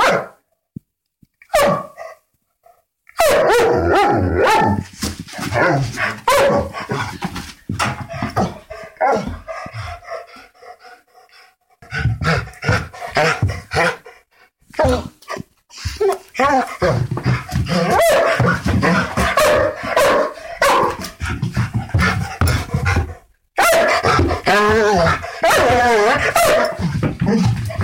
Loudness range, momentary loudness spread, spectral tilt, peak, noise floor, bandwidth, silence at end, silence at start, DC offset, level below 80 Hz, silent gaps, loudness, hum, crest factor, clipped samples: 9 LU; 16 LU; -5 dB/octave; -2 dBFS; -62 dBFS; 17 kHz; 0 s; 0 s; under 0.1%; -34 dBFS; none; -17 LUFS; none; 16 dB; under 0.1%